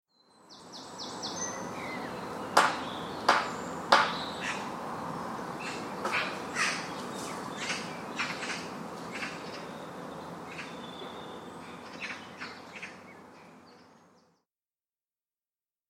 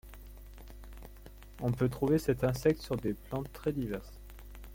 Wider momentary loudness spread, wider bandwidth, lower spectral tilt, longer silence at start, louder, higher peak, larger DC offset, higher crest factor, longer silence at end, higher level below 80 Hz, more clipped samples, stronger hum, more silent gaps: second, 18 LU vs 23 LU; about the same, 16.5 kHz vs 17 kHz; second, -2.5 dB/octave vs -7.5 dB/octave; first, 0.45 s vs 0.05 s; about the same, -33 LUFS vs -33 LUFS; first, -4 dBFS vs -14 dBFS; neither; first, 32 dB vs 20 dB; first, 1.9 s vs 0 s; second, -68 dBFS vs -50 dBFS; neither; neither; neither